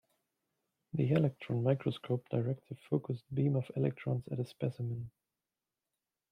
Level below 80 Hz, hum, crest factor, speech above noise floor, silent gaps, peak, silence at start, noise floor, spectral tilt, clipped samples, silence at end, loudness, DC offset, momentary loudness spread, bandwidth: -72 dBFS; none; 20 dB; over 56 dB; none; -16 dBFS; 0.95 s; under -90 dBFS; -9.5 dB/octave; under 0.1%; 1.25 s; -35 LUFS; under 0.1%; 9 LU; 9.4 kHz